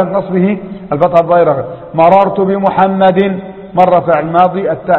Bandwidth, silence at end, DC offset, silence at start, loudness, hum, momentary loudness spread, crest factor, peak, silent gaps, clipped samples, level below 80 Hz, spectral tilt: 5.4 kHz; 0 s; under 0.1%; 0 s; -11 LUFS; none; 10 LU; 10 dB; 0 dBFS; none; 0.4%; -46 dBFS; -9.5 dB/octave